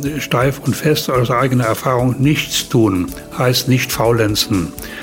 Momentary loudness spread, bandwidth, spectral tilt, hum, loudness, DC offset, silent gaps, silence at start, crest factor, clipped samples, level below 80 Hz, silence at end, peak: 4 LU; 16.5 kHz; -5 dB/octave; none; -16 LUFS; under 0.1%; none; 0 s; 12 dB; under 0.1%; -38 dBFS; 0 s; -2 dBFS